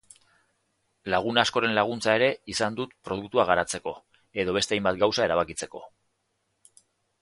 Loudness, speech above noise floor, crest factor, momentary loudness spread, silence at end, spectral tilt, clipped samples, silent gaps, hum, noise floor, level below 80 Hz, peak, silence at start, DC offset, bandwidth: -26 LUFS; 50 dB; 24 dB; 14 LU; 1.35 s; -3.5 dB/octave; under 0.1%; none; none; -75 dBFS; -58 dBFS; -2 dBFS; 1.05 s; under 0.1%; 11.5 kHz